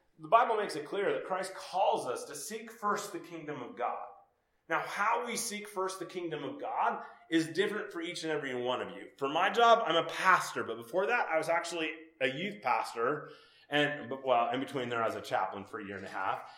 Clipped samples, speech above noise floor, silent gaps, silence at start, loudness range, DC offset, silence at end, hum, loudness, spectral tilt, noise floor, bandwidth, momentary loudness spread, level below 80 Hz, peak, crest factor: under 0.1%; 36 dB; none; 0.2 s; 7 LU; under 0.1%; 0 s; none; -33 LUFS; -3.5 dB/octave; -69 dBFS; 16.5 kHz; 13 LU; -84 dBFS; -10 dBFS; 24 dB